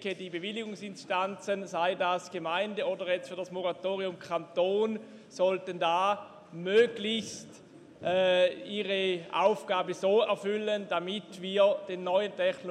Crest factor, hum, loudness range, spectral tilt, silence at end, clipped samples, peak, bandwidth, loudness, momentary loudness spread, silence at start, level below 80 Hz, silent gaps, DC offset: 18 dB; none; 4 LU; -4.5 dB/octave; 0 s; under 0.1%; -12 dBFS; 10.5 kHz; -30 LUFS; 11 LU; 0 s; -80 dBFS; none; under 0.1%